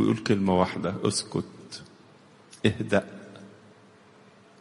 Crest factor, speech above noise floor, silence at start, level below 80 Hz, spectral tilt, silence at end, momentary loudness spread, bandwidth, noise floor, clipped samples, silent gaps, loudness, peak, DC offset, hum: 24 dB; 29 dB; 0 s; -60 dBFS; -5.5 dB/octave; 1.1 s; 20 LU; 11.5 kHz; -55 dBFS; under 0.1%; none; -27 LUFS; -6 dBFS; under 0.1%; none